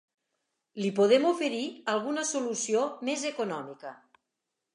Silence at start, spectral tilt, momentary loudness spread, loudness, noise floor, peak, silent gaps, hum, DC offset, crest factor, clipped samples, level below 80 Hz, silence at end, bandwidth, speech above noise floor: 0.75 s; -3.5 dB/octave; 17 LU; -29 LUFS; -85 dBFS; -10 dBFS; none; none; under 0.1%; 20 dB; under 0.1%; -84 dBFS; 0.8 s; 11.5 kHz; 57 dB